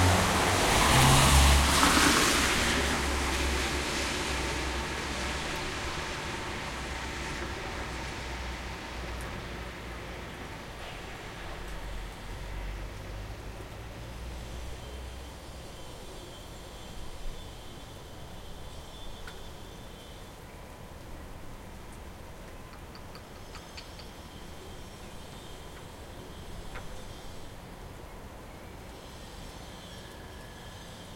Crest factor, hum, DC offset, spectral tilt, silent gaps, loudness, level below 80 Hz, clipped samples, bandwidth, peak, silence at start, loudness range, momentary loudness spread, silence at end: 24 dB; none; under 0.1%; -3.5 dB/octave; none; -28 LUFS; -40 dBFS; under 0.1%; 16.5 kHz; -8 dBFS; 0 s; 21 LU; 23 LU; 0 s